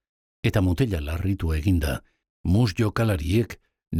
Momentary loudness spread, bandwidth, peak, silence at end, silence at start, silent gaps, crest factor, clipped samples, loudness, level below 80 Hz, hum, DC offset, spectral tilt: 9 LU; 15.5 kHz; -8 dBFS; 0 s; 0.45 s; 2.30-2.44 s; 16 dB; under 0.1%; -25 LUFS; -38 dBFS; none; under 0.1%; -7 dB/octave